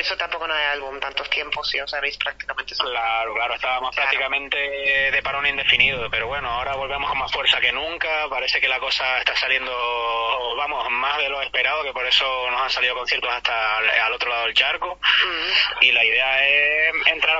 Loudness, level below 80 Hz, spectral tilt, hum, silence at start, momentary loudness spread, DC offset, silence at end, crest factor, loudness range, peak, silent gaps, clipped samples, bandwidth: -20 LUFS; -50 dBFS; -1.5 dB/octave; none; 0 s; 8 LU; under 0.1%; 0 s; 20 dB; 5 LU; -2 dBFS; none; under 0.1%; 8 kHz